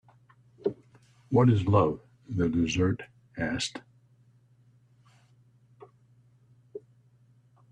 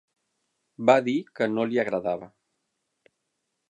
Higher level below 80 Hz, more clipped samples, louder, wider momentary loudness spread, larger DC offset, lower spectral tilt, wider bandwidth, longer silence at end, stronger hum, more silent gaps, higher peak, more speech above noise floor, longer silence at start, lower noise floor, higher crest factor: first, -58 dBFS vs -72 dBFS; neither; second, -28 LUFS vs -25 LUFS; first, 25 LU vs 9 LU; neither; about the same, -6.5 dB/octave vs -6 dB/octave; about the same, 10 kHz vs 9.4 kHz; second, 0.95 s vs 1.4 s; neither; neither; second, -10 dBFS vs -6 dBFS; second, 37 dB vs 55 dB; second, 0.65 s vs 0.8 s; second, -62 dBFS vs -79 dBFS; about the same, 20 dB vs 22 dB